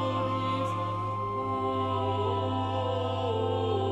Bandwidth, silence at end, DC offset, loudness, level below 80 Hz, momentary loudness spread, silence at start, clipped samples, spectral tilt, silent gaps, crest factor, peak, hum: 8.4 kHz; 0 s; under 0.1%; -30 LUFS; -58 dBFS; 3 LU; 0 s; under 0.1%; -7.5 dB/octave; none; 12 dB; -16 dBFS; none